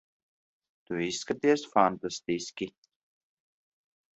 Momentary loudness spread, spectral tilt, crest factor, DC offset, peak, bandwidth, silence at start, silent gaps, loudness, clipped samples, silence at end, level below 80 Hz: 12 LU; -4 dB/octave; 24 dB; under 0.1%; -8 dBFS; 8.2 kHz; 0.9 s; none; -29 LUFS; under 0.1%; 1.45 s; -70 dBFS